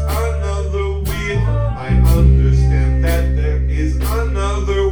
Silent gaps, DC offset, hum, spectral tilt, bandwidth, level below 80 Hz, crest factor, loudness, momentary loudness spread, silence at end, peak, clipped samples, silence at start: none; under 0.1%; none; -7 dB/octave; over 20 kHz; -16 dBFS; 14 dB; -17 LUFS; 8 LU; 0 s; -2 dBFS; under 0.1%; 0 s